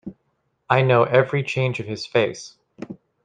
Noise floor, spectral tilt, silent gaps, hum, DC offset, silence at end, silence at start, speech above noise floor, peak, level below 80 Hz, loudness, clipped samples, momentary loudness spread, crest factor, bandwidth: -71 dBFS; -6 dB/octave; none; none; under 0.1%; 0.3 s; 0.05 s; 51 dB; -2 dBFS; -60 dBFS; -20 LUFS; under 0.1%; 23 LU; 20 dB; 9.2 kHz